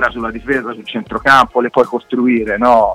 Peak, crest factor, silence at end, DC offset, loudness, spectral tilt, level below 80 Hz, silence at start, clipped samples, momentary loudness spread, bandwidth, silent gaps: 0 dBFS; 14 dB; 0 s; under 0.1%; -14 LUFS; -5.5 dB/octave; -40 dBFS; 0 s; under 0.1%; 13 LU; 13.5 kHz; none